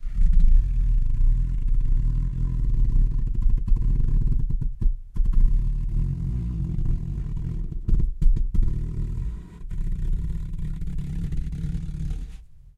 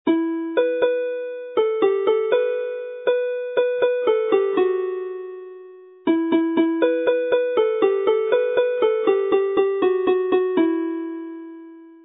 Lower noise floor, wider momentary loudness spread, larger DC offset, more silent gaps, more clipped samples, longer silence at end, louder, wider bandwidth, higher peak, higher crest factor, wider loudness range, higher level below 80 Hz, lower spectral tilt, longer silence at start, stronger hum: about the same, -41 dBFS vs -43 dBFS; about the same, 8 LU vs 10 LU; neither; neither; neither; first, 0.25 s vs 0.1 s; second, -28 LUFS vs -21 LUFS; second, 1.9 kHz vs 4 kHz; about the same, -6 dBFS vs -6 dBFS; about the same, 14 dB vs 16 dB; first, 6 LU vs 2 LU; first, -22 dBFS vs -72 dBFS; about the same, -9 dB/octave vs -9 dB/octave; about the same, 0 s vs 0.05 s; neither